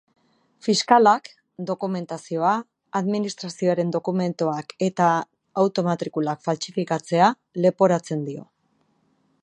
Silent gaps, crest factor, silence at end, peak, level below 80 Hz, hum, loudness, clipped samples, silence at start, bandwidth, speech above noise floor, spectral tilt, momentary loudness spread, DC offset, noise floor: none; 22 dB; 1 s; -2 dBFS; -74 dBFS; none; -23 LUFS; under 0.1%; 0.65 s; 10.5 kHz; 45 dB; -5.5 dB/octave; 11 LU; under 0.1%; -67 dBFS